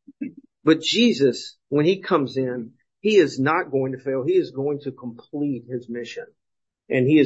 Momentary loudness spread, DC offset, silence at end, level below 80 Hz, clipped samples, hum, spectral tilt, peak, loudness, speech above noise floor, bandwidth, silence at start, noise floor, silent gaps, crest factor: 16 LU; under 0.1%; 0 s; -70 dBFS; under 0.1%; none; -5.5 dB/octave; -4 dBFS; -22 LUFS; 61 dB; 8 kHz; 0.1 s; -82 dBFS; none; 18 dB